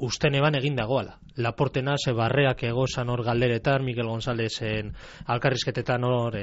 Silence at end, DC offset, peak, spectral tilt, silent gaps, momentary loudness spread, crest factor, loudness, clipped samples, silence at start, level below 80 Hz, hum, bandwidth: 0 s; under 0.1%; -8 dBFS; -5 dB/octave; none; 8 LU; 18 dB; -26 LUFS; under 0.1%; 0 s; -48 dBFS; none; 8 kHz